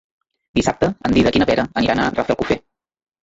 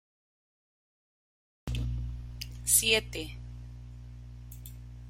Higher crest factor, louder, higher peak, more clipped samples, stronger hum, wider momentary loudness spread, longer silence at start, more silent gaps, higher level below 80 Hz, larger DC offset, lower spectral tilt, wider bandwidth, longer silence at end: second, 16 dB vs 26 dB; first, -18 LUFS vs -28 LUFS; first, -2 dBFS vs -10 dBFS; neither; second, none vs 60 Hz at -40 dBFS; second, 6 LU vs 24 LU; second, 0.55 s vs 1.65 s; neither; about the same, -40 dBFS vs -44 dBFS; neither; first, -5.5 dB/octave vs -2 dB/octave; second, 8 kHz vs 16 kHz; first, 0.65 s vs 0 s